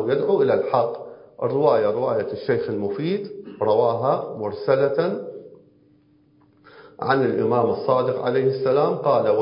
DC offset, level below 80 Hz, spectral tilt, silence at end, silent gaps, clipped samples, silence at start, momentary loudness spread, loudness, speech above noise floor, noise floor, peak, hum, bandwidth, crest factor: under 0.1%; -64 dBFS; -11.5 dB/octave; 0 s; none; under 0.1%; 0 s; 10 LU; -22 LUFS; 37 dB; -57 dBFS; -4 dBFS; none; 5.4 kHz; 18 dB